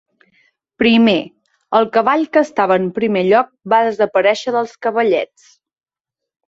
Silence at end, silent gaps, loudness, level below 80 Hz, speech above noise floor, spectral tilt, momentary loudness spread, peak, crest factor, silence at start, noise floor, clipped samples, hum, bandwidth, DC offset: 1.25 s; none; -15 LUFS; -58 dBFS; 69 dB; -5.5 dB/octave; 7 LU; -2 dBFS; 16 dB; 0.8 s; -83 dBFS; under 0.1%; none; 7.8 kHz; under 0.1%